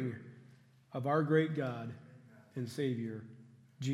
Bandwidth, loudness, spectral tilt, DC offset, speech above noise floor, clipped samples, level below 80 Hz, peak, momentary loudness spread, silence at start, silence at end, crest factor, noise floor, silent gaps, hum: 13 kHz; -36 LUFS; -7.5 dB/octave; under 0.1%; 27 dB; under 0.1%; -82 dBFS; -18 dBFS; 20 LU; 0 s; 0 s; 20 dB; -62 dBFS; none; none